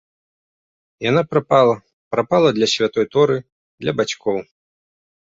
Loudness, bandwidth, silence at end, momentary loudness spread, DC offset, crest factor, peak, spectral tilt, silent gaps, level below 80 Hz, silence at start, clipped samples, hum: -18 LUFS; 7.8 kHz; 0.8 s; 10 LU; under 0.1%; 18 dB; -2 dBFS; -5 dB/octave; 1.93-2.11 s, 3.52-3.78 s; -58 dBFS; 1 s; under 0.1%; none